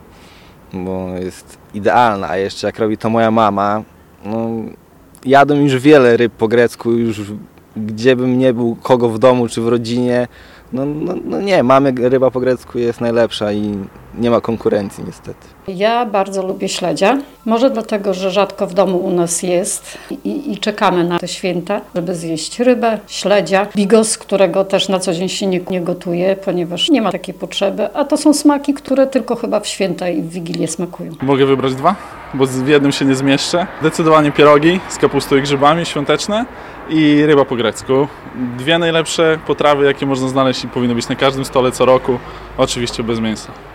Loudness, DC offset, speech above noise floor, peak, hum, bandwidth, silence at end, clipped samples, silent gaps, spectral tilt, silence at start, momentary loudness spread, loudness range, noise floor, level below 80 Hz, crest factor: -15 LUFS; under 0.1%; 26 dB; 0 dBFS; none; 16.5 kHz; 0 s; under 0.1%; none; -5 dB/octave; 0.75 s; 12 LU; 4 LU; -41 dBFS; -46 dBFS; 14 dB